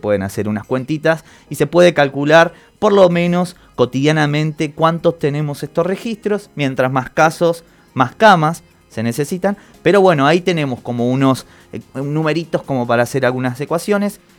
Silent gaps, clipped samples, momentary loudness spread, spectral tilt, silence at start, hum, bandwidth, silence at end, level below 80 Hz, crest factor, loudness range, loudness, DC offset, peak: none; under 0.1%; 11 LU; -6 dB/octave; 0.05 s; none; 18.5 kHz; 0.25 s; -52 dBFS; 16 dB; 4 LU; -16 LUFS; under 0.1%; 0 dBFS